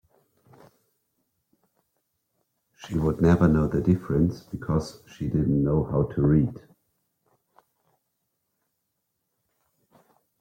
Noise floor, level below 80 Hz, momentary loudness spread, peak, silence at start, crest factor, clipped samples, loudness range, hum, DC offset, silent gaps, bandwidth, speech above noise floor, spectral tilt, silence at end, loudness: -79 dBFS; -46 dBFS; 10 LU; -8 dBFS; 2.8 s; 20 dB; under 0.1%; 7 LU; none; under 0.1%; none; 9.8 kHz; 56 dB; -9 dB/octave; 3.8 s; -24 LUFS